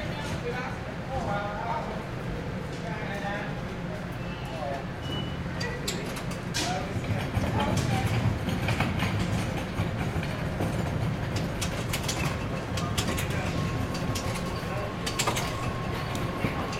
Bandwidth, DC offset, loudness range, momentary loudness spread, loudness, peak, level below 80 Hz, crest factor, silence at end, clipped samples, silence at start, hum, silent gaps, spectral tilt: 16.5 kHz; under 0.1%; 5 LU; 7 LU; -30 LUFS; -10 dBFS; -42 dBFS; 20 dB; 0 s; under 0.1%; 0 s; none; none; -5 dB/octave